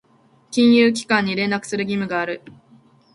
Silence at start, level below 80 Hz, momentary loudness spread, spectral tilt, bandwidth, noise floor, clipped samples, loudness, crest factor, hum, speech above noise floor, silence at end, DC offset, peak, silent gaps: 0.5 s; -62 dBFS; 12 LU; -5 dB/octave; 11.5 kHz; -56 dBFS; under 0.1%; -19 LUFS; 18 dB; none; 38 dB; 0.75 s; under 0.1%; -2 dBFS; none